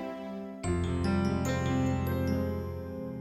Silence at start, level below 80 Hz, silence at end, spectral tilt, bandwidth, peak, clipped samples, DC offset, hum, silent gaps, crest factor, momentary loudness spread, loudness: 0 s; -46 dBFS; 0 s; -7 dB/octave; 14.5 kHz; -16 dBFS; under 0.1%; under 0.1%; none; none; 14 dB; 9 LU; -32 LUFS